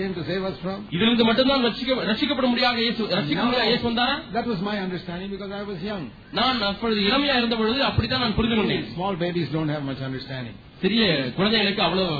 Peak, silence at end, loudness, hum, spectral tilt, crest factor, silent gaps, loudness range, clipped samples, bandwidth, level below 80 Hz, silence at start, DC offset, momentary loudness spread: -8 dBFS; 0 s; -23 LUFS; none; -7.5 dB/octave; 14 dB; none; 4 LU; under 0.1%; 5 kHz; -46 dBFS; 0 s; under 0.1%; 12 LU